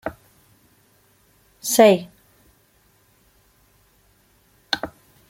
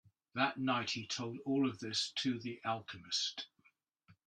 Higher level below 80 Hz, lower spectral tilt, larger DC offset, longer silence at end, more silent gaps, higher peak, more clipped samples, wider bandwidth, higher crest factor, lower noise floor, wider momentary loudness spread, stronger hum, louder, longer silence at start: first, -60 dBFS vs -80 dBFS; about the same, -3.5 dB/octave vs -3.5 dB/octave; neither; first, 0.4 s vs 0.15 s; neither; first, -2 dBFS vs -18 dBFS; neither; first, 16.5 kHz vs 9.8 kHz; about the same, 24 dB vs 20 dB; second, -60 dBFS vs -74 dBFS; first, 22 LU vs 7 LU; neither; first, -19 LUFS vs -37 LUFS; second, 0.05 s vs 0.35 s